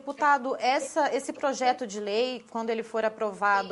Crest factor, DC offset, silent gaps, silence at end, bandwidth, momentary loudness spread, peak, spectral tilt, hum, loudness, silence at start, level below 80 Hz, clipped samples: 16 dB; under 0.1%; none; 0 s; 11.5 kHz; 7 LU; -10 dBFS; -3 dB/octave; none; -28 LUFS; 0.05 s; -76 dBFS; under 0.1%